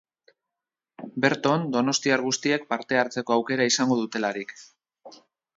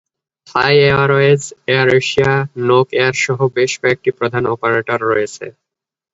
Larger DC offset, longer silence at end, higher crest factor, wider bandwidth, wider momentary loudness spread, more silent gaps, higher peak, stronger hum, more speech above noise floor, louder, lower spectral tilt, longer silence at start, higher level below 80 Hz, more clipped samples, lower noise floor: neither; second, 0.4 s vs 0.65 s; first, 22 dB vs 14 dB; about the same, 7.8 kHz vs 8 kHz; about the same, 9 LU vs 7 LU; neither; second, -4 dBFS vs 0 dBFS; neither; second, 64 dB vs 70 dB; second, -24 LUFS vs -14 LUFS; second, -3.5 dB/octave vs -5 dB/octave; first, 1 s vs 0.5 s; second, -74 dBFS vs -50 dBFS; neither; first, -88 dBFS vs -84 dBFS